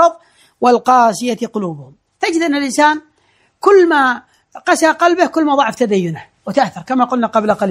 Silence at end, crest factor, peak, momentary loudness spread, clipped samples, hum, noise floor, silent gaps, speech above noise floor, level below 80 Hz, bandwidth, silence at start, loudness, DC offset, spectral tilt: 0 s; 14 dB; 0 dBFS; 12 LU; under 0.1%; none; -57 dBFS; none; 44 dB; -60 dBFS; 15 kHz; 0 s; -14 LUFS; under 0.1%; -4.5 dB/octave